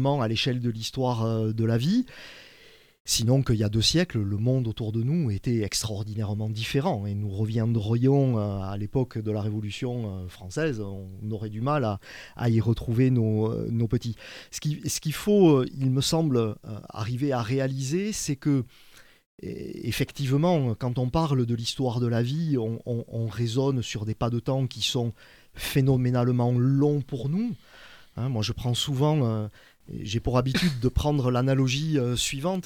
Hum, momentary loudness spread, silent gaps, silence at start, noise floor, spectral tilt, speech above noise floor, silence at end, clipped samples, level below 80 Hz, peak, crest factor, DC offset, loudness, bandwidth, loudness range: none; 11 LU; 3.00-3.05 s, 19.26-19.38 s; 0 s; -54 dBFS; -6 dB/octave; 28 dB; 0.05 s; under 0.1%; -46 dBFS; -8 dBFS; 18 dB; under 0.1%; -26 LUFS; 16.5 kHz; 4 LU